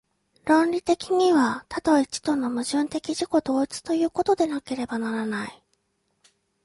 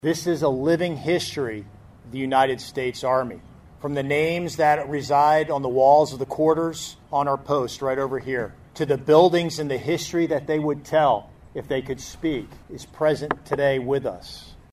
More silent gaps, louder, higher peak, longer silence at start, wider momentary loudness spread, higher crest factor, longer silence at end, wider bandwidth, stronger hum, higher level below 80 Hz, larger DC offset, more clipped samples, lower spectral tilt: neither; about the same, -24 LUFS vs -22 LUFS; second, -6 dBFS vs -2 dBFS; first, 0.45 s vs 0.05 s; second, 9 LU vs 15 LU; about the same, 18 dB vs 20 dB; first, 1.1 s vs 0.15 s; second, 11.5 kHz vs 15 kHz; neither; second, -60 dBFS vs -52 dBFS; neither; neither; second, -4 dB/octave vs -5.5 dB/octave